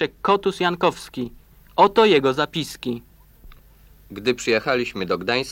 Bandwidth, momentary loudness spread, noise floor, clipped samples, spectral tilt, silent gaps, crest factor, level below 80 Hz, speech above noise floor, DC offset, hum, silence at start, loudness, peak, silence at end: 16.5 kHz; 16 LU; -50 dBFS; under 0.1%; -4.5 dB/octave; none; 20 dB; -50 dBFS; 29 dB; under 0.1%; none; 0 s; -21 LUFS; -2 dBFS; 0 s